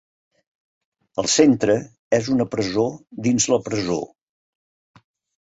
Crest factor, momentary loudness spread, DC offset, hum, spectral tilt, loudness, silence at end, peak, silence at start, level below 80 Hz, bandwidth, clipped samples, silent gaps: 20 dB; 10 LU; under 0.1%; none; -4 dB/octave; -20 LUFS; 1.35 s; -2 dBFS; 1.15 s; -56 dBFS; 8.2 kHz; under 0.1%; 1.98-2.11 s